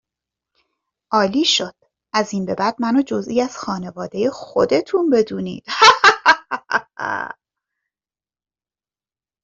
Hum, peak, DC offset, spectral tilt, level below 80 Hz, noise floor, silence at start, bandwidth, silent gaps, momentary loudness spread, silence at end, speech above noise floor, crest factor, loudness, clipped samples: none; 0 dBFS; under 0.1%; -3.5 dB/octave; -60 dBFS; under -90 dBFS; 1.1 s; 8 kHz; none; 15 LU; 2.1 s; over 71 dB; 20 dB; -18 LUFS; under 0.1%